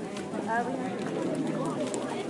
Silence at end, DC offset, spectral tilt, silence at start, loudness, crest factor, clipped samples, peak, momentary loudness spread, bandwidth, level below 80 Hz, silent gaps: 0 s; under 0.1%; -5.5 dB/octave; 0 s; -32 LUFS; 18 dB; under 0.1%; -14 dBFS; 3 LU; 11.5 kHz; -72 dBFS; none